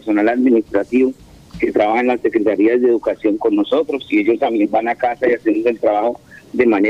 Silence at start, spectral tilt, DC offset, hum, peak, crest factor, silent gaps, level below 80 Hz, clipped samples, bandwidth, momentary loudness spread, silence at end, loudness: 0.05 s; -7 dB/octave; under 0.1%; none; -2 dBFS; 14 dB; none; -52 dBFS; under 0.1%; 7.6 kHz; 5 LU; 0 s; -16 LUFS